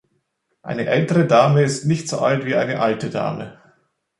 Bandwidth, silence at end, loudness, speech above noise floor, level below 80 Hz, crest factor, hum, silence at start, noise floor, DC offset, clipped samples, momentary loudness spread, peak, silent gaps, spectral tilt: 11.5 kHz; 0.65 s; -19 LUFS; 52 dB; -60 dBFS; 18 dB; none; 0.65 s; -70 dBFS; under 0.1%; under 0.1%; 15 LU; -2 dBFS; none; -6 dB/octave